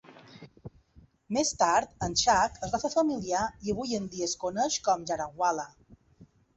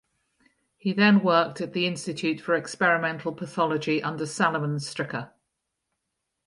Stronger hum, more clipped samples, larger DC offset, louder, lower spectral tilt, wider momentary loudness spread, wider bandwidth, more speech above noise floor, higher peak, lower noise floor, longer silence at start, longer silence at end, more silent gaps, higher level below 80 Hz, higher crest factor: neither; neither; neither; second, -29 LUFS vs -25 LUFS; second, -3 dB/octave vs -5.5 dB/octave; second, 9 LU vs 12 LU; second, 8.4 kHz vs 11.5 kHz; second, 31 dB vs 56 dB; about the same, -10 dBFS vs -8 dBFS; second, -60 dBFS vs -81 dBFS; second, 0.1 s vs 0.85 s; second, 0.3 s vs 1.2 s; neither; first, -56 dBFS vs -72 dBFS; about the same, 20 dB vs 20 dB